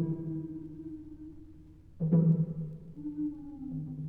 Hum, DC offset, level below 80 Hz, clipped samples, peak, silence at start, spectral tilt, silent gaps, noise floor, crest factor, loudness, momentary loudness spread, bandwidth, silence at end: none; under 0.1%; -58 dBFS; under 0.1%; -16 dBFS; 0 s; -13 dB/octave; none; -53 dBFS; 18 dB; -33 LUFS; 22 LU; 1.7 kHz; 0 s